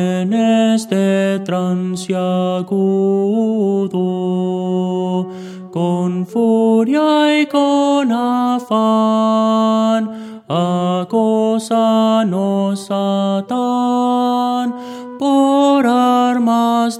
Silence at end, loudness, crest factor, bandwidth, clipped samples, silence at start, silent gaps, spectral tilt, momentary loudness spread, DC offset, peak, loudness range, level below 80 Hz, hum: 0 s; -15 LUFS; 12 dB; 13 kHz; under 0.1%; 0 s; none; -6.5 dB/octave; 6 LU; under 0.1%; -2 dBFS; 3 LU; -70 dBFS; none